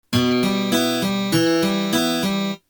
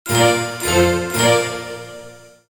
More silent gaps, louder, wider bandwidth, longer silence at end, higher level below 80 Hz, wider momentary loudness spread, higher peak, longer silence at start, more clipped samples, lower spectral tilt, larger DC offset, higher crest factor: neither; second, -19 LUFS vs -16 LUFS; about the same, over 20 kHz vs 19 kHz; second, 0.15 s vs 0.3 s; second, -54 dBFS vs -42 dBFS; second, 3 LU vs 18 LU; second, -6 dBFS vs -2 dBFS; about the same, 0.1 s vs 0.05 s; neither; about the same, -4.5 dB/octave vs -4 dB/octave; neither; about the same, 14 dB vs 16 dB